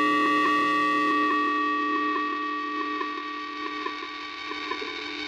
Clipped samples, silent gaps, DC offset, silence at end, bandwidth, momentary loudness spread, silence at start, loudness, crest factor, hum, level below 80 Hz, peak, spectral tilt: under 0.1%; none; under 0.1%; 0 s; 12.5 kHz; 11 LU; 0 s; -26 LUFS; 14 dB; none; -68 dBFS; -14 dBFS; -3.5 dB/octave